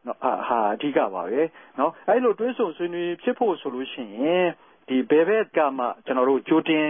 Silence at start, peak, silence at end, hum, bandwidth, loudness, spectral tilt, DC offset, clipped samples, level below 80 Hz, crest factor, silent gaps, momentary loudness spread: 0.05 s; -8 dBFS; 0 s; none; 3.7 kHz; -24 LUFS; -10 dB/octave; under 0.1%; under 0.1%; -76 dBFS; 16 dB; none; 8 LU